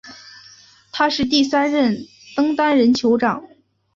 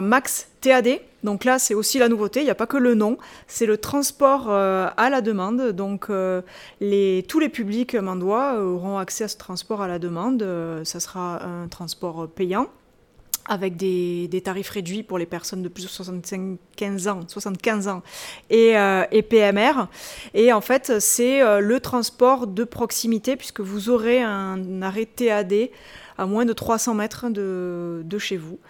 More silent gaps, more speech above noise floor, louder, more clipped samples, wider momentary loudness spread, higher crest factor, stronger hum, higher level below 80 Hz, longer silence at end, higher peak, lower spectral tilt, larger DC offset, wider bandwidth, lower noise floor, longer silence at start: neither; about the same, 31 dB vs 32 dB; first, -18 LUFS vs -22 LUFS; neither; about the same, 14 LU vs 13 LU; about the same, 16 dB vs 20 dB; neither; about the same, -56 dBFS vs -58 dBFS; first, 0.5 s vs 0.1 s; about the same, -4 dBFS vs -2 dBFS; about the same, -4.5 dB/octave vs -4 dB/octave; neither; second, 7.6 kHz vs 19 kHz; second, -48 dBFS vs -54 dBFS; about the same, 0.05 s vs 0 s